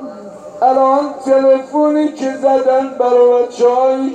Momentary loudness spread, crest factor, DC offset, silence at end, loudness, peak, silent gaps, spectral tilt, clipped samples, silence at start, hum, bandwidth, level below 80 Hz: 6 LU; 12 dB; under 0.1%; 0 s; -13 LUFS; -2 dBFS; none; -5 dB/octave; under 0.1%; 0 s; none; 9 kHz; -64 dBFS